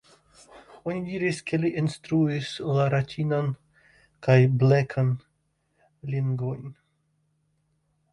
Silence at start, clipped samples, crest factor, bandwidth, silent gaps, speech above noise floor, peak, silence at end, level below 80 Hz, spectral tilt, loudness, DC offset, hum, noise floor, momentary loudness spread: 0.55 s; under 0.1%; 18 dB; 11 kHz; none; 48 dB; -8 dBFS; 1.4 s; -62 dBFS; -7.5 dB/octave; -25 LUFS; under 0.1%; none; -72 dBFS; 14 LU